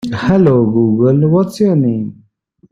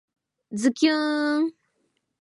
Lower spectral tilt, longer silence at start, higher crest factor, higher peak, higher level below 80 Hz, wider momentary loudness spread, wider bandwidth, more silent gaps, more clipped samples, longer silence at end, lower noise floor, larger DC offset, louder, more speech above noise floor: first, -9 dB/octave vs -3.5 dB/octave; second, 0.05 s vs 0.5 s; second, 10 dB vs 18 dB; first, -2 dBFS vs -8 dBFS; first, -44 dBFS vs -80 dBFS; about the same, 7 LU vs 8 LU; first, 13 kHz vs 11.5 kHz; neither; neither; about the same, 0.6 s vs 0.7 s; second, -52 dBFS vs -73 dBFS; neither; first, -12 LUFS vs -24 LUFS; second, 41 dB vs 51 dB